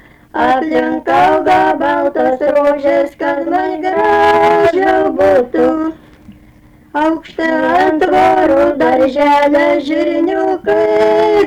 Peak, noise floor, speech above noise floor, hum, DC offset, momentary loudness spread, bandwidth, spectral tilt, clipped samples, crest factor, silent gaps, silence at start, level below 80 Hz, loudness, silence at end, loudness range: -4 dBFS; -43 dBFS; 32 dB; none; under 0.1%; 6 LU; 13.5 kHz; -5.5 dB/octave; under 0.1%; 8 dB; none; 0.35 s; -44 dBFS; -12 LUFS; 0 s; 3 LU